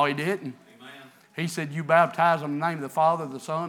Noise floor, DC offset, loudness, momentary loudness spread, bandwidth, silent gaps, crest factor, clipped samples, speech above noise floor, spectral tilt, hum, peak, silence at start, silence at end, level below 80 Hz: -48 dBFS; under 0.1%; -25 LUFS; 19 LU; 17.5 kHz; none; 20 dB; under 0.1%; 23 dB; -5.5 dB/octave; none; -6 dBFS; 0 s; 0 s; -90 dBFS